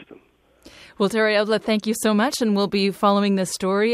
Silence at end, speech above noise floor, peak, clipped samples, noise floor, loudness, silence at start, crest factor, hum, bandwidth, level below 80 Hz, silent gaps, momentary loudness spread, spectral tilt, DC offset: 0 s; 35 dB; -6 dBFS; under 0.1%; -55 dBFS; -20 LUFS; 0 s; 16 dB; none; 15.5 kHz; -60 dBFS; none; 4 LU; -4.5 dB/octave; under 0.1%